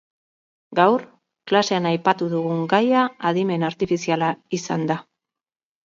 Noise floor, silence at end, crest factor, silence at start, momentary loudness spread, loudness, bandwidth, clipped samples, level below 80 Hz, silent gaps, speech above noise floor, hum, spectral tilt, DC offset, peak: under -90 dBFS; 0.85 s; 20 dB; 0.7 s; 7 LU; -21 LUFS; 7.6 kHz; under 0.1%; -64 dBFS; none; over 70 dB; none; -5.5 dB/octave; under 0.1%; -2 dBFS